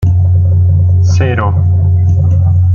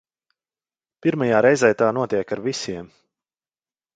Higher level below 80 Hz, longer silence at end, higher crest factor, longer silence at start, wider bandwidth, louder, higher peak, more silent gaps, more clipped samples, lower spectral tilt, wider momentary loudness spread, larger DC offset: first, -30 dBFS vs -62 dBFS; second, 0 s vs 1.1 s; second, 6 dB vs 20 dB; second, 0 s vs 1.05 s; second, 6.8 kHz vs 9.4 kHz; first, -10 LUFS vs -20 LUFS; about the same, -2 dBFS vs -2 dBFS; neither; neither; first, -8 dB/octave vs -5.5 dB/octave; second, 2 LU vs 12 LU; neither